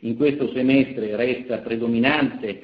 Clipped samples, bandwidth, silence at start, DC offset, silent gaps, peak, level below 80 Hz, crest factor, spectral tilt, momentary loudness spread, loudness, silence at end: under 0.1%; 5.2 kHz; 0 s; under 0.1%; none; -4 dBFS; -58 dBFS; 18 dB; -9 dB/octave; 6 LU; -21 LUFS; 0 s